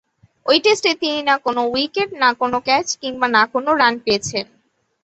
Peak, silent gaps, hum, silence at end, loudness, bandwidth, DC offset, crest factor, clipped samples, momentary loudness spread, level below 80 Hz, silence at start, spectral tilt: -2 dBFS; none; none; 0.6 s; -17 LUFS; 8.2 kHz; under 0.1%; 18 dB; under 0.1%; 8 LU; -58 dBFS; 0.45 s; -2.5 dB/octave